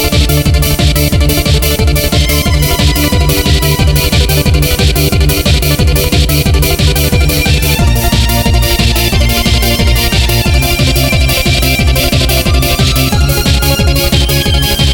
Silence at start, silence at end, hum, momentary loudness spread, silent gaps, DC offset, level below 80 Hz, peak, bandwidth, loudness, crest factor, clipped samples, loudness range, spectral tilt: 0 s; 0 s; none; 1 LU; none; under 0.1%; -12 dBFS; 0 dBFS; 19.5 kHz; -9 LUFS; 8 dB; under 0.1%; 0 LU; -4.5 dB/octave